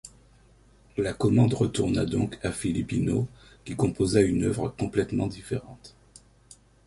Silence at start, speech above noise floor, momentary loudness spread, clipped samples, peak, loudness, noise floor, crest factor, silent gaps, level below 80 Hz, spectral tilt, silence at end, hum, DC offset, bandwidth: 0.05 s; 31 dB; 12 LU; under 0.1%; -8 dBFS; -27 LUFS; -57 dBFS; 20 dB; none; -48 dBFS; -6.5 dB/octave; 1 s; none; under 0.1%; 11.5 kHz